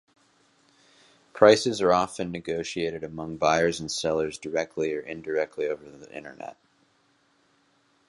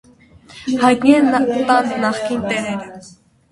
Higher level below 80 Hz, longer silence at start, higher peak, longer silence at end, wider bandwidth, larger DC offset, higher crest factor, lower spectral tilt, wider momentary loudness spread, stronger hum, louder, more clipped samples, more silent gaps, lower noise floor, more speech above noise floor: second, -60 dBFS vs -54 dBFS; first, 1.35 s vs 0.55 s; about the same, -2 dBFS vs 0 dBFS; first, 1.55 s vs 0.4 s; about the same, 11.5 kHz vs 11.5 kHz; neither; first, 26 dB vs 16 dB; about the same, -4 dB/octave vs -5 dB/octave; first, 22 LU vs 14 LU; neither; second, -26 LUFS vs -16 LUFS; neither; neither; first, -66 dBFS vs -45 dBFS; first, 41 dB vs 30 dB